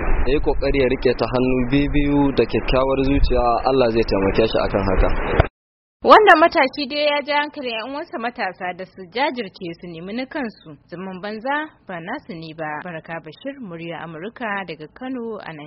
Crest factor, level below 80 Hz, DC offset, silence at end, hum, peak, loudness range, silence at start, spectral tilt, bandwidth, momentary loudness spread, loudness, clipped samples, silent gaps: 20 dB; -28 dBFS; under 0.1%; 0 s; none; 0 dBFS; 13 LU; 0 s; -4 dB/octave; 6 kHz; 15 LU; -19 LUFS; under 0.1%; 5.50-6.00 s